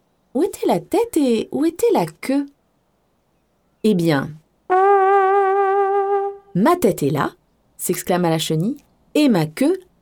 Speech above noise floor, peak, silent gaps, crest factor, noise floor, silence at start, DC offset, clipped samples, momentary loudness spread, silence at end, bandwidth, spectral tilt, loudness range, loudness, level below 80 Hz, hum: 46 dB; -4 dBFS; none; 16 dB; -64 dBFS; 0.35 s; under 0.1%; under 0.1%; 9 LU; 0.2 s; over 20 kHz; -5.5 dB/octave; 4 LU; -19 LUFS; -56 dBFS; none